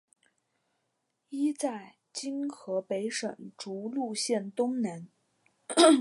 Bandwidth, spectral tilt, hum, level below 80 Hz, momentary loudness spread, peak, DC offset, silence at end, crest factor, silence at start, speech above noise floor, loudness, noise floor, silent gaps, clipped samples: 11.5 kHz; -3.5 dB/octave; none; -88 dBFS; 12 LU; -8 dBFS; under 0.1%; 0 s; 24 dB; 1.3 s; 51 dB; -31 LUFS; -80 dBFS; none; under 0.1%